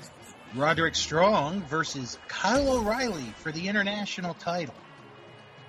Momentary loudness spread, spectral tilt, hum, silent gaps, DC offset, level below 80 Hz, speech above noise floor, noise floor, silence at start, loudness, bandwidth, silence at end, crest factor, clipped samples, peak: 12 LU; -4 dB/octave; none; none; under 0.1%; -52 dBFS; 22 dB; -49 dBFS; 0 s; -27 LUFS; 15 kHz; 0 s; 20 dB; under 0.1%; -10 dBFS